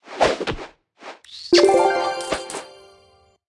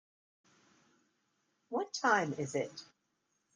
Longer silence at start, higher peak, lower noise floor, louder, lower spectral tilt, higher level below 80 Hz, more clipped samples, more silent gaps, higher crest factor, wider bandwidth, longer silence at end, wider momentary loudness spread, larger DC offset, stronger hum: second, 0.05 s vs 1.7 s; first, -2 dBFS vs -14 dBFS; second, -56 dBFS vs -81 dBFS; first, -19 LUFS vs -34 LUFS; about the same, -3.5 dB/octave vs -4 dB/octave; first, -48 dBFS vs -84 dBFS; neither; neither; second, 18 dB vs 26 dB; first, 12 kHz vs 10 kHz; about the same, 0.8 s vs 0.7 s; first, 24 LU vs 12 LU; neither; neither